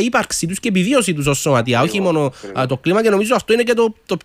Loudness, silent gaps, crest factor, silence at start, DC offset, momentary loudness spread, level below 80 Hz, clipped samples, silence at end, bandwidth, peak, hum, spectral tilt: -16 LUFS; none; 14 dB; 0 s; under 0.1%; 5 LU; -48 dBFS; under 0.1%; 0.05 s; 16 kHz; -2 dBFS; none; -4.5 dB/octave